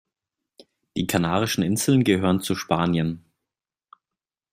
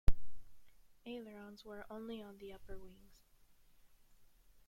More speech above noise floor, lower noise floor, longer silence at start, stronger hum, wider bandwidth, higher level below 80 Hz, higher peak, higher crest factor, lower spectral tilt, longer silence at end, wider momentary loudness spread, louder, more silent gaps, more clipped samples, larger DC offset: first, 68 dB vs 17 dB; first, -89 dBFS vs -66 dBFS; first, 0.95 s vs 0.1 s; neither; first, 16 kHz vs 7 kHz; second, -58 dBFS vs -46 dBFS; first, -6 dBFS vs -14 dBFS; about the same, 20 dB vs 22 dB; second, -5 dB/octave vs -6.5 dB/octave; second, 1.35 s vs 1.8 s; second, 10 LU vs 18 LU; first, -23 LUFS vs -51 LUFS; neither; neither; neither